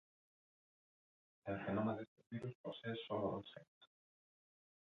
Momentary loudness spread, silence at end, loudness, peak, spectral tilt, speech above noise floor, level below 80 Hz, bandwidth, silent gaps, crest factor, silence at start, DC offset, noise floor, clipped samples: 12 LU; 1.1 s; -45 LUFS; -28 dBFS; -5.5 dB/octave; over 46 dB; -76 dBFS; 6.6 kHz; 2.08-2.16 s, 2.55-2.64 s, 3.68-3.81 s; 18 dB; 1.45 s; under 0.1%; under -90 dBFS; under 0.1%